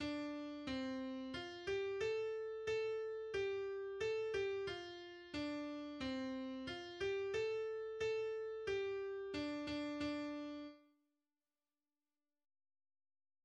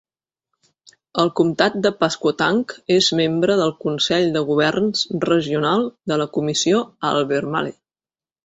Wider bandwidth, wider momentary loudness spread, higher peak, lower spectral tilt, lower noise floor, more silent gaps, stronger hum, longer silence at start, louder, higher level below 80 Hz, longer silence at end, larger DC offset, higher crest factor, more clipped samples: first, 9.8 kHz vs 8.2 kHz; about the same, 6 LU vs 5 LU; second, -30 dBFS vs -2 dBFS; about the same, -5 dB/octave vs -4.5 dB/octave; about the same, under -90 dBFS vs under -90 dBFS; neither; neither; second, 0 s vs 1.15 s; second, -44 LUFS vs -19 LUFS; second, -70 dBFS vs -60 dBFS; first, 2.65 s vs 0.7 s; neither; about the same, 14 dB vs 18 dB; neither